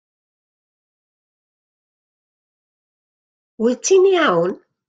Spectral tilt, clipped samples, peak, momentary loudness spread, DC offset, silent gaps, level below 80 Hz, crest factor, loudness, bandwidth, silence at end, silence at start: -3.5 dB/octave; under 0.1%; -4 dBFS; 9 LU; under 0.1%; none; -74 dBFS; 18 dB; -16 LUFS; 9 kHz; 0.35 s; 3.6 s